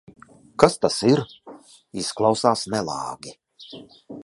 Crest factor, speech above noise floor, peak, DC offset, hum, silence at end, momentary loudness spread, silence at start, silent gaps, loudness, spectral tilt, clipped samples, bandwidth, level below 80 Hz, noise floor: 24 dB; 24 dB; 0 dBFS; under 0.1%; none; 0 s; 22 LU; 0.6 s; none; -22 LUFS; -5 dB/octave; under 0.1%; 11.5 kHz; -58 dBFS; -46 dBFS